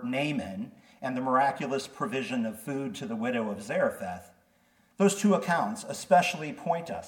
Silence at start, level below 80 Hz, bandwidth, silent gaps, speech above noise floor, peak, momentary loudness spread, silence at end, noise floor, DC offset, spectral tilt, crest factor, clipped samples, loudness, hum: 0 s; -72 dBFS; 18 kHz; none; 37 dB; -8 dBFS; 14 LU; 0 s; -66 dBFS; under 0.1%; -5 dB/octave; 20 dB; under 0.1%; -29 LUFS; none